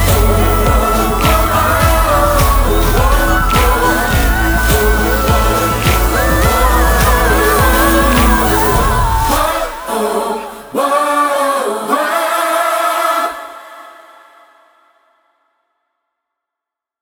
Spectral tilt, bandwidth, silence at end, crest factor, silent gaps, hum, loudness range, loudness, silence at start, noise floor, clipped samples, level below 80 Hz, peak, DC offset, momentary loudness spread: -4.5 dB/octave; over 20 kHz; 3.1 s; 12 dB; none; none; 6 LU; -12 LUFS; 0 s; -83 dBFS; under 0.1%; -18 dBFS; 0 dBFS; under 0.1%; 6 LU